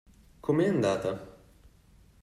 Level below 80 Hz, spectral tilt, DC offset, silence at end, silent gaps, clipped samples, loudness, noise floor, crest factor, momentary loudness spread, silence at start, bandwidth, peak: -60 dBFS; -7 dB/octave; under 0.1%; 0.9 s; none; under 0.1%; -29 LUFS; -59 dBFS; 16 dB; 12 LU; 0.45 s; 14 kHz; -14 dBFS